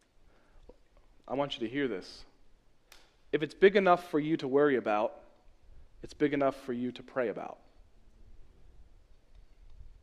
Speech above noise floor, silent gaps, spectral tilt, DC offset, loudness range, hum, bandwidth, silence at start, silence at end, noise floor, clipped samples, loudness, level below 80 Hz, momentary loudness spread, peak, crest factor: 32 dB; none; -6.5 dB/octave; under 0.1%; 10 LU; none; 12 kHz; 1.25 s; 0.1 s; -62 dBFS; under 0.1%; -30 LUFS; -58 dBFS; 17 LU; -10 dBFS; 24 dB